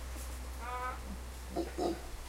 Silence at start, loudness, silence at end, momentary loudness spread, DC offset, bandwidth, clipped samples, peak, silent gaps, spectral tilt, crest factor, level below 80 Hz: 0 s; -41 LUFS; 0 s; 8 LU; under 0.1%; 16 kHz; under 0.1%; -20 dBFS; none; -5 dB/octave; 20 dB; -44 dBFS